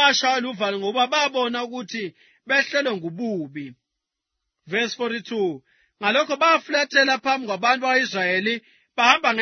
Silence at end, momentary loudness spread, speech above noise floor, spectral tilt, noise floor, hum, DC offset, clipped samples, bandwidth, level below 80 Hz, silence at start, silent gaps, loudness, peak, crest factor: 0 s; 12 LU; 61 dB; -2.5 dB/octave; -83 dBFS; none; under 0.1%; under 0.1%; 6.6 kHz; -74 dBFS; 0 s; none; -21 LUFS; 0 dBFS; 22 dB